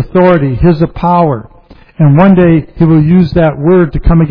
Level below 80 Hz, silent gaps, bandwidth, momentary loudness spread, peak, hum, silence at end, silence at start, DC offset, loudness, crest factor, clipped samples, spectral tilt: -22 dBFS; none; 5.2 kHz; 5 LU; 0 dBFS; none; 0 s; 0 s; under 0.1%; -8 LUFS; 8 dB; 0.6%; -11.5 dB/octave